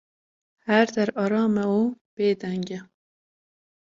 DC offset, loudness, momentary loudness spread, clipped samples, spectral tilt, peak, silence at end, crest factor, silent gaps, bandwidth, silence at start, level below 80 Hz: under 0.1%; -24 LUFS; 12 LU; under 0.1%; -6.5 dB/octave; -4 dBFS; 1.15 s; 20 dB; 2.01-2.17 s; 7.6 kHz; 0.65 s; -68 dBFS